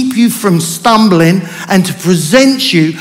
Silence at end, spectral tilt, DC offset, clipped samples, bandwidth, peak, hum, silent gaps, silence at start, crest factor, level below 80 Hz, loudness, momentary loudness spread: 0 s; -5 dB/octave; under 0.1%; 0.7%; 16.5 kHz; 0 dBFS; none; none; 0 s; 10 dB; -50 dBFS; -9 LUFS; 5 LU